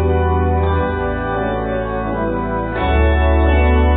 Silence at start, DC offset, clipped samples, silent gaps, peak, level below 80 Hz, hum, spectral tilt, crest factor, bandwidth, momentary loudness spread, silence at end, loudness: 0 s; under 0.1%; under 0.1%; none; -4 dBFS; -18 dBFS; none; -12.5 dB/octave; 12 dB; 3.9 kHz; 7 LU; 0 s; -17 LUFS